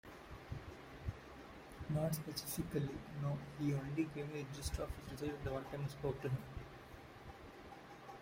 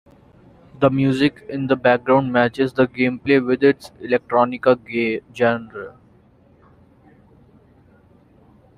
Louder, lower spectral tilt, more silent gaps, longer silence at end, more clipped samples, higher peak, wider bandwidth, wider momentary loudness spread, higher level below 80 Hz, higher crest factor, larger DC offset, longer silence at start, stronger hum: second, -44 LUFS vs -19 LUFS; second, -6 dB/octave vs -7.5 dB/octave; neither; second, 0 s vs 2.9 s; neither; second, -26 dBFS vs -2 dBFS; first, 16 kHz vs 11.5 kHz; first, 15 LU vs 10 LU; about the same, -56 dBFS vs -56 dBFS; about the same, 18 dB vs 18 dB; neither; second, 0.05 s vs 0.8 s; neither